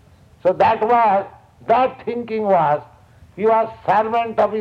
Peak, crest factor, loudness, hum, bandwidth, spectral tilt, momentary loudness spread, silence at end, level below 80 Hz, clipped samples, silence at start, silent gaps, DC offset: -4 dBFS; 14 dB; -18 LUFS; none; 6.8 kHz; -7.5 dB/octave; 9 LU; 0 s; -56 dBFS; under 0.1%; 0.45 s; none; under 0.1%